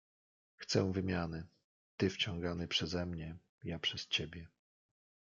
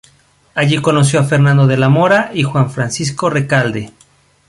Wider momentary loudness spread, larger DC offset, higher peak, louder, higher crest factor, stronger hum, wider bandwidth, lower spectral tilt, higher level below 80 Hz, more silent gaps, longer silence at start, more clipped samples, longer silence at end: first, 15 LU vs 8 LU; neither; second, -18 dBFS vs 0 dBFS; second, -37 LUFS vs -13 LUFS; first, 22 dB vs 14 dB; neither; second, 7.6 kHz vs 11.5 kHz; second, -4.5 dB/octave vs -6 dB/octave; second, -64 dBFS vs -50 dBFS; first, 1.64-1.98 s, 3.49-3.58 s vs none; about the same, 0.6 s vs 0.55 s; neither; first, 0.8 s vs 0.6 s